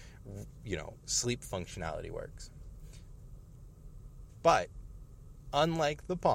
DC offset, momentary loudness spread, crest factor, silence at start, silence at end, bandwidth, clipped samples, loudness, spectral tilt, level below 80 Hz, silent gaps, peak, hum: under 0.1%; 25 LU; 24 dB; 0 s; 0 s; 16.5 kHz; under 0.1%; -33 LUFS; -4 dB/octave; -50 dBFS; none; -12 dBFS; none